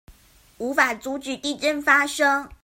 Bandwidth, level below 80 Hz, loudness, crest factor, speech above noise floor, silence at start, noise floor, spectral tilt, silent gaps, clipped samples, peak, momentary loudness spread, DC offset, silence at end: 16.5 kHz; -56 dBFS; -21 LUFS; 22 dB; 32 dB; 0.1 s; -54 dBFS; -1.5 dB/octave; none; under 0.1%; -2 dBFS; 12 LU; under 0.1%; 0.1 s